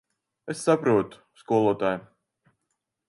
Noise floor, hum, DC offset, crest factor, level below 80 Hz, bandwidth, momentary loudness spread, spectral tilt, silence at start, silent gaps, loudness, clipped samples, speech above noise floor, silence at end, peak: -80 dBFS; none; under 0.1%; 20 dB; -68 dBFS; 11.5 kHz; 15 LU; -6 dB/octave; 0.45 s; none; -25 LUFS; under 0.1%; 56 dB; 1.1 s; -8 dBFS